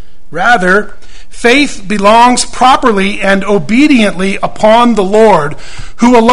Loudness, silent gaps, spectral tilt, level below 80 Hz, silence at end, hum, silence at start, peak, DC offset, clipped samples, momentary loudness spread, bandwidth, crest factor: -8 LUFS; none; -4.5 dB/octave; -30 dBFS; 0 s; none; 0.3 s; 0 dBFS; 10%; 2%; 8 LU; 11.5 kHz; 10 dB